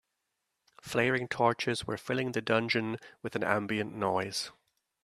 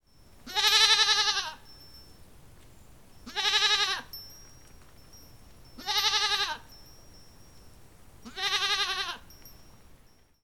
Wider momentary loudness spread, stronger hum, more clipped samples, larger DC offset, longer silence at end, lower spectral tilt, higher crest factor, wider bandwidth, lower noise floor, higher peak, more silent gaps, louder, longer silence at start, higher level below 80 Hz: second, 10 LU vs 23 LU; neither; neither; second, under 0.1% vs 0.2%; second, 0.55 s vs 0.9 s; first, -4.5 dB/octave vs 1 dB/octave; about the same, 24 dB vs 24 dB; second, 14 kHz vs 19 kHz; first, -83 dBFS vs -59 dBFS; second, -10 dBFS vs -6 dBFS; neither; second, -31 LUFS vs -25 LUFS; first, 0.85 s vs 0.45 s; second, -68 dBFS vs -58 dBFS